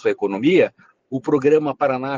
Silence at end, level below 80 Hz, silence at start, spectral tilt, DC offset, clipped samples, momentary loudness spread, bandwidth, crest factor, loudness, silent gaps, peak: 0 s; -64 dBFS; 0.05 s; -7 dB/octave; under 0.1%; under 0.1%; 8 LU; 7.4 kHz; 14 dB; -19 LUFS; none; -4 dBFS